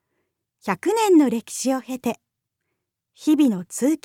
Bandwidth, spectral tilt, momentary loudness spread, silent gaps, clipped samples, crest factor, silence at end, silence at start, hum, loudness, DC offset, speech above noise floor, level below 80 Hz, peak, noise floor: 16 kHz; -4.5 dB/octave; 12 LU; none; under 0.1%; 16 dB; 0.1 s; 0.65 s; none; -21 LUFS; under 0.1%; 59 dB; -74 dBFS; -6 dBFS; -79 dBFS